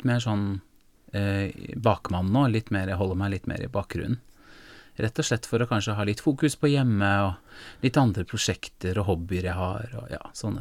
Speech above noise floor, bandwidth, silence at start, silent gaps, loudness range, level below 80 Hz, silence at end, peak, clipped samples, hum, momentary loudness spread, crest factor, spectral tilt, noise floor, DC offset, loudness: 23 dB; 15.5 kHz; 0 s; none; 4 LU; -48 dBFS; 0 s; -6 dBFS; under 0.1%; none; 11 LU; 20 dB; -6 dB/octave; -49 dBFS; under 0.1%; -27 LUFS